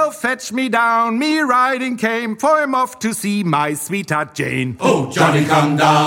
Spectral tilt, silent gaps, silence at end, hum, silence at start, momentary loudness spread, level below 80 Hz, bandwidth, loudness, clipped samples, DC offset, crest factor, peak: -5 dB/octave; none; 0 s; none; 0 s; 6 LU; -60 dBFS; 17 kHz; -17 LUFS; under 0.1%; under 0.1%; 16 dB; -2 dBFS